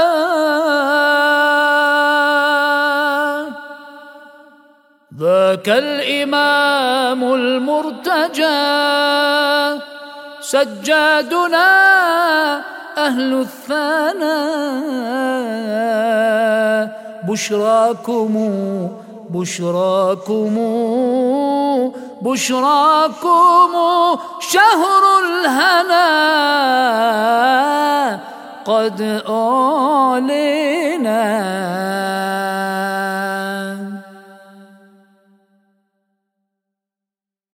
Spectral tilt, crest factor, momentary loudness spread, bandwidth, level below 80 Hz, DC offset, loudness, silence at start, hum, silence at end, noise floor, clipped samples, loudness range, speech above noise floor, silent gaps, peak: -3.5 dB/octave; 16 dB; 10 LU; 17.5 kHz; -70 dBFS; under 0.1%; -15 LUFS; 0 s; none; 2.9 s; -88 dBFS; under 0.1%; 6 LU; 73 dB; none; 0 dBFS